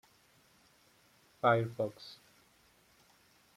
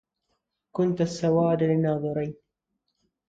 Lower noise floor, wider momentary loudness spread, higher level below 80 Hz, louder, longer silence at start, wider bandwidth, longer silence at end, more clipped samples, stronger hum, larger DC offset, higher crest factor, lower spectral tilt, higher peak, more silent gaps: second, -67 dBFS vs -80 dBFS; first, 22 LU vs 10 LU; second, -78 dBFS vs -62 dBFS; second, -33 LUFS vs -25 LUFS; first, 1.45 s vs 0.75 s; first, 15.5 kHz vs 7.8 kHz; first, 1.45 s vs 0.95 s; neither; neither; neither; first, 24 dB vs 16 dB; about the same, -7 dB/octave vs -8 dB/octave; about the same, -14 dBFS vs -12 dBFS; neither